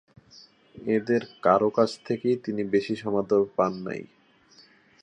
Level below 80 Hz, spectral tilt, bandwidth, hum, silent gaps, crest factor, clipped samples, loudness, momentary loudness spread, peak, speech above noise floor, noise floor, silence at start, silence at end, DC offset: -66 dBFS; -7 dB/octave; 9.8 kHz; none; none; 20 dB; under 0.1%; -26 LUFS; 11 LU; -6 dBFS; 32 dB; -57 dBFS; 0.75 s; 1 s; under 0.1%